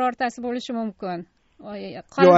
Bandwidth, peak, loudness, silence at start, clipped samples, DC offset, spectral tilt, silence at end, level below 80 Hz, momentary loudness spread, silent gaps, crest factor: 8 kHz; -2 dBFS; -27 LUFS; 0 s; under 0.1%; under 0.1%; -5 dB/octave; 0 s; -64 dBFS; 15 LU; none; 20 dB